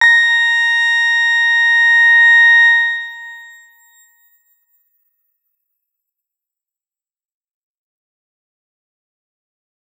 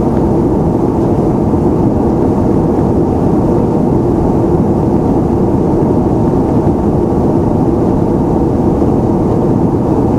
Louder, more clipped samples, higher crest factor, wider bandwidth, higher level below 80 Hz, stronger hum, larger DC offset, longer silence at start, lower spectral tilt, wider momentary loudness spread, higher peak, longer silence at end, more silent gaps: first, -9 LUFS vs -12 LUFS; neither; first, 16 dB vs 10 dB; first, 16 kHz vs 12 kHz; second, under -90 dBFS vs -24 dBFS; neither; neither; about the same, 0 s vs 0 s; second, 6.5 dB/octave vs -10.5 dB/octave; first, 11 LU vs 1 LU; about the same, -2 dBFS vs 0 dBFS; first, 6.55 s vs 0 s; neither